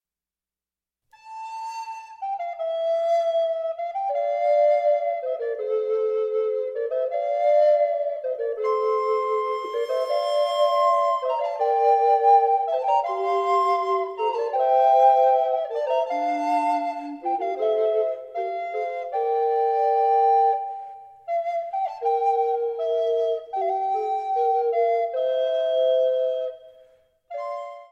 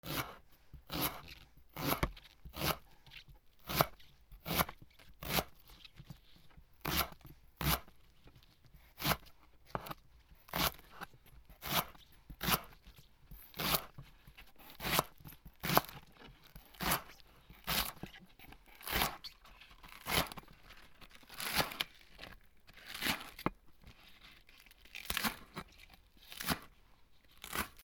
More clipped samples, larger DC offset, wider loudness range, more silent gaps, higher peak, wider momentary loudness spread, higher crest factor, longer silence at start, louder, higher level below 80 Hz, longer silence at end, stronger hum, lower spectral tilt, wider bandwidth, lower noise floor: neither; neither; about the same, 5 LU vs 4 LU; neither; about the same, -6 dBFS vs -8 dBFS; second, 11 LU vs 23 LU; second, 16 dB vs 34 dB; first, 1.25 s vs 0.05 s; first, -23 LUFS vs -37 LUFS; second, -78 dBFS vs -56 dBFS; about the same, 0.05 s vs 0 s; neither; about the same, -2.5 dB/octave vs -3 dB/octave; second, 10 kHz vs over 20 kHz; first, under -90 dBFS vs -63 dBFS